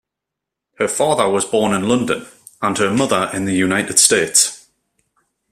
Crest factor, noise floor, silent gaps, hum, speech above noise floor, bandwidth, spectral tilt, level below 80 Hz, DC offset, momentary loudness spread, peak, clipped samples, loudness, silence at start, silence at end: 18 dB; -82 dBFS; none; none; 66 dB; 16 kHz; -2.5 dB/octave; -54 dBFS; under 0.1%; 10 LU; 0 dBFS; under 0.1%; -16 LUFS; 0.8 s; 0.95 s